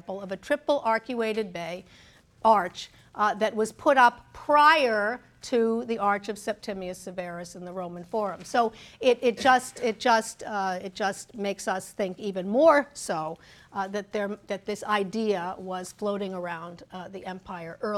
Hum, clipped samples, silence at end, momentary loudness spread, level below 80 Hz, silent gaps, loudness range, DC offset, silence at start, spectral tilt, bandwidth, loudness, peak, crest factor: none; under 0.1%; 0 s; 17 LU; -64 dBFS; none; 8 LU; under 0.1%; 0.1 s; -4 dB/octave; 15.5 kHz; -26 LUFS; -6 dBFS; 22 dB